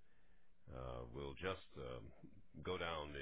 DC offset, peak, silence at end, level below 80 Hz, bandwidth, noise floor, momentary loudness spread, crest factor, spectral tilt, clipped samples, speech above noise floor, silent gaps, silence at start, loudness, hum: 0.1%; -30 dBFS; 0 s; -62 dBFS; 4 kHz; -73 dBFS; 16 LU; 20 dB; -3.5 dB/octave; under 0.1%; 25 dB; none; 0.15 s; -49 LUFS; none